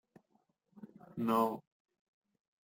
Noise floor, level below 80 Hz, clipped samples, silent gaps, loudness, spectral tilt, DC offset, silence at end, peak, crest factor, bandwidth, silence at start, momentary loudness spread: -77 dBFS; -80 dBFS; under 0.1%; none; -34 LUFS; -6.5 dB/octave; under 0.1%; 1.05 s; -18 dBFS; 22 dB; 16.5 kHz; 0.8 s; 24 LU